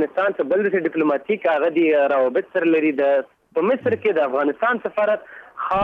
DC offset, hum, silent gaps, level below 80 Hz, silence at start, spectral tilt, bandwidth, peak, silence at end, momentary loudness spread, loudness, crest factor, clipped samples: under 0.1%; none; none; -62 dBFS; 0 s; -8 dB/octave; 5 kHz; -8 dBFS; 0 s; 6 LU; -20 LUFS; 12 dB; under 0.1%